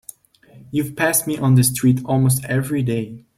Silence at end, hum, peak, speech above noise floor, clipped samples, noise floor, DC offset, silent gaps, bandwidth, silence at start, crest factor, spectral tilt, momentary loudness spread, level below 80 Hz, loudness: 0.2 s; none; -2 dBFS; 31 dB; under 0.1%; -49 dBFS; under 0.1%; none; 16.5 kHz; 0.55 s; 18 dB; -5.5 dB/octave; 9 LU; -52 dBFS; -18 LUFS